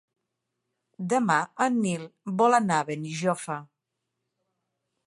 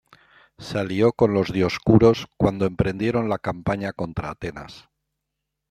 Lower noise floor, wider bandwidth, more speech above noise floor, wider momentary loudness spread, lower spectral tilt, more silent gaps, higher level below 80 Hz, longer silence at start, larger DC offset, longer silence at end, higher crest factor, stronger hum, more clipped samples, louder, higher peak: about the same, -83 dBFS vs -81 dBFS; second, 11.5 kHz vs 13.5 kHz; about the same, 57 dB vs 60 dB; second, 13 LU vs 16 LU; second, -5 dB/octave vs -7.5 dB/octave; neither; second, -76 dBFS vs -46 dBFS; first, 1 s vs 0.6 s; neither; first, 1.4 s vs 0.9 s; about the same, 20 dB vs 20 dB; neither; neither; second, -26 LUFS vs -22 LUFS; second, -8 dBFS vs -2 dBFS